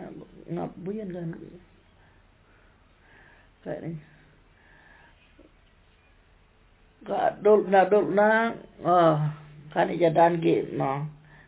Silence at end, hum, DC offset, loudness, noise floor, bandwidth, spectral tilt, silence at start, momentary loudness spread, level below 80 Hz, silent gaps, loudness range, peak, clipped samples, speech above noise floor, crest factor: 0.35 s; none; under 0.1%; -24 LUFS; -59 dBFS; 4 kHz; -10.5 dB/octave; 0 s; 21 LU; -62 dBFS; none; 21 LU; -8 dBFS; under 0.1%; 35 dB; 18 dB